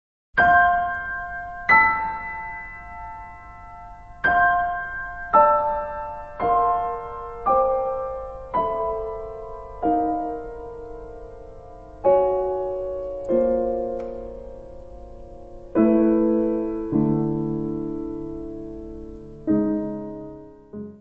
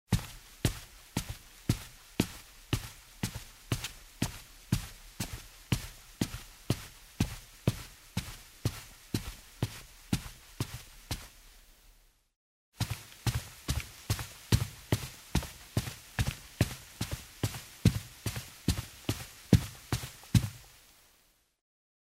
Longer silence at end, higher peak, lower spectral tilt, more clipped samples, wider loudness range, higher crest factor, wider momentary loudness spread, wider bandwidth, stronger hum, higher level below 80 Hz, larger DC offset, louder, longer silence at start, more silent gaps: second, 0 s vs 1.4 s; about the same, -4 dBFS vs -6 dBFS; first, -9 dB/octave vs -5 dB/octave; neither; about the same, 6 LU vs 7 LU; second, 20 dB vs 30 dB; first, 23 LU vs 16 LU; second, 5.2 kHz vs 16 kHz; first, 50 Hz at -50 dBFS vs none; about the same, -44 dBFS vs -46 dBFS; first, 0.2% vs under 0.1%; first, -22 LUFS vs -36 LUFS; first, 0.35 s vs 0.1 s; second, none vs 12.36-12.72 s